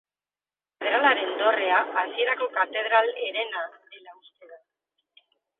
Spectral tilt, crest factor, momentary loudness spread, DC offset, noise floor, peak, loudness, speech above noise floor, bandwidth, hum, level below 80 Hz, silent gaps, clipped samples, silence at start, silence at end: -4.5 dB/octave; 20 dB; 10 LU; under 0.1%; under -90 dBFS; -8 dBFS; -24 LUFS; over 65 dB; 4.2 kHz; none; -88 dBFS; none; under 0.1%; 0.8 s; 1.05 s